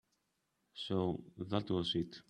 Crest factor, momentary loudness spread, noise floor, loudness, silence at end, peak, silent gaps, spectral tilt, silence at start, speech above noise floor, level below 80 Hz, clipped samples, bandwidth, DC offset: 22 dB; 10 LU; -82 dBFS; -38 LUFS; 0.1 s; -18 dBFS; none; -7 dB/octave; 0.75 s; 45 dB; -68 dBFS; under 0.1%; 10.5 kHz; under 0.1%